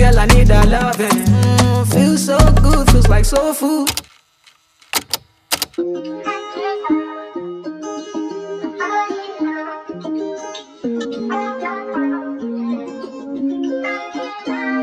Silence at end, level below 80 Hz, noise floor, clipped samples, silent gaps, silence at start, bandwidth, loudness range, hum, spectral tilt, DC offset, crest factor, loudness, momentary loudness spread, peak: 0 s; -20 dBFS; -53 dBFS; under 0.1%; none; 0 s; 15.5 kHz; 11 LU; none; -5.5 dB/octave; under 0.1%; 16 dB; -17 LUFS; 15 LU; 0 dBFS